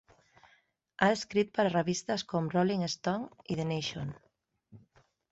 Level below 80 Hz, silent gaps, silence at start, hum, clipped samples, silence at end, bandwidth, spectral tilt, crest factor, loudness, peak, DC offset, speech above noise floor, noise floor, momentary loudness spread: -68 dBFS; none; 1 s; none; under 0.1%; 0.55 s; 8.2 kHz; -5 dB/octave; 24 dB; -32 LUFS; -10 dBFS; under 0.1%; 39 dB; -70 dBFS; 9 LU